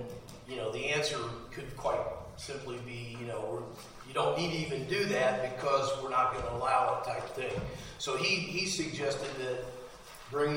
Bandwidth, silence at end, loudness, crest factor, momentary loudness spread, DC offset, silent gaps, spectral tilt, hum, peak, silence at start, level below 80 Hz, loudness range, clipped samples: 16 kHz; 0 s; -33 LUFS; 20 dB; 14 LU; under 0.1%; none; -4 dB/octave; none; -14 dBFS; 0 s; -56 dBFS; 5 LU; under 0.1%